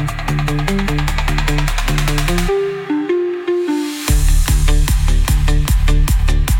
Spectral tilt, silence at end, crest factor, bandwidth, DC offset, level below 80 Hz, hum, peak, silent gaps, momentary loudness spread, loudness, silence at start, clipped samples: -5 dB/octave; 0 s; 12 dB; 17 kHz; under 0.1%; -16 dBFS; none; -2 dBFS; none; 3 LU; -17 LUFS; 0 s; under 0.1%